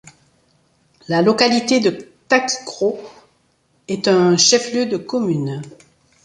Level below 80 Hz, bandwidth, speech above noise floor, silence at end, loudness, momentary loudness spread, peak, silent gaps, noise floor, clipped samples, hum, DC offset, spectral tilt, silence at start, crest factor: -62 dBFS; 11 kHz; 45 dB; 0.5 s; -17 LUFS; 15 LU; -2 dBFS; none; -61 dBFS; under 0.1%; none; under 0.1%; -3.5 dB/octave; 1.1 s; 18 dB